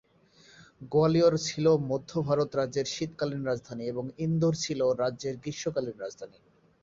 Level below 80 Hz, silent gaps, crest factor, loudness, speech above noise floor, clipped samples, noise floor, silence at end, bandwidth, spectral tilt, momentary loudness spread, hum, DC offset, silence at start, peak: -62 dBFS; none; 18 dB; -29 LUFS; 31 dB; under 0.1%; -60 dBFS; 0.55 s; 7.8 kHz; -6 dB/octave; 11 LU; none; under 0.1%; 0.6 s; -12 dBFS